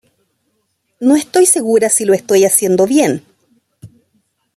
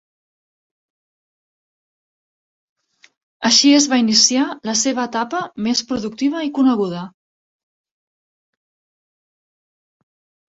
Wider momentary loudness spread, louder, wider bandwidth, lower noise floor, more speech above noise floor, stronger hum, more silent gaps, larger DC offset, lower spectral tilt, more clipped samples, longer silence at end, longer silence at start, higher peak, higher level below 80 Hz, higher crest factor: second, 5 LU vs 12 LU; first, -12 LUFS vs -16 LUFS; first, 15 kHz vs 8 kHz; second, -66 dBFS vs under -90 dBFS; second, 54 dB vs over 73 dB; neither; neither; neither; first, -3.5 dB/octave vs -2 dB/octave; neither; second, 0.7 s vs 3.45 s; second, 1 s vs 3.4 s; about the same, 0 dBFS vs 0 dBFS; about the same, -62 dBFS vs -64 dBFS; second, 14 dB vs 20 dB